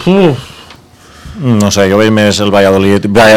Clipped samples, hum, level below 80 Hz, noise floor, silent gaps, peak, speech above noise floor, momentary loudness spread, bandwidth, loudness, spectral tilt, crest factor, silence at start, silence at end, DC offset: 5%; none; -38 dBFS; -37 dBFS; none; 0 dBFS; 30 dB; 12 LU; 16.5 kHz; -8 LUFS; -5.5 dB/octave; 8 dB; 0 s; 0 s; under 0.1%